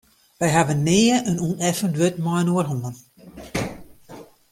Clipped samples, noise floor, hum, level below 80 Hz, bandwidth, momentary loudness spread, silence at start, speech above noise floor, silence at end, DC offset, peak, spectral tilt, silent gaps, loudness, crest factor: under 0.1%; -44 dBFS; none; -52 dBFS; 16 kHz; 13 LU; 0.4 s; 24 dB; 0.3 s; under 0.1%; -4 dBFS; -5 dB/octave; none; -21 LUFS; 18 dB